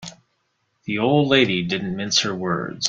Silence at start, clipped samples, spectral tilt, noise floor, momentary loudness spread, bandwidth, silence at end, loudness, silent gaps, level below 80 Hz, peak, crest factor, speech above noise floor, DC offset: 0 s; under 0.1%; -4 dB/octave; -70 dBFS; 12 LU; 9.2 kHz; 0 s; -20 LUFS; none; -58 dBFS; -2 dBFS; 20 dB; 50 dB; under 0.1%